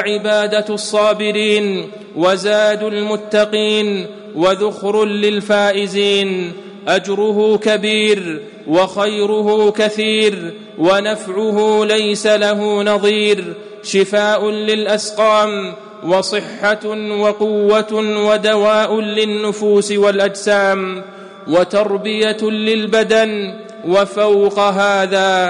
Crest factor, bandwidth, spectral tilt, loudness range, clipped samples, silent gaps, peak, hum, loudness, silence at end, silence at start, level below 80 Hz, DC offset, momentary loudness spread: 12 dB; 11 kHz; -4 dB/octave; 1 LU; under 0.1%; none; -4 dBFS; none; -15 LUFS; 0 s; 0 s; -62 dBFS; under 0.1%; 7 LU